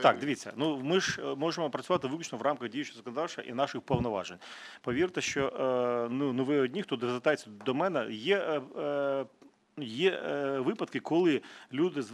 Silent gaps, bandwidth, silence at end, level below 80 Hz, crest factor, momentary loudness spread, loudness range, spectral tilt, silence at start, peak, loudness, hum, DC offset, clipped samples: none; 12 kHz; 0 s; -64 dBFS; 22 dB; 8 LU; 3 LU; -5 dB/octave; 0 s; -8 dBFS; -32 LUFS; none; under 0.1%; under 0.1%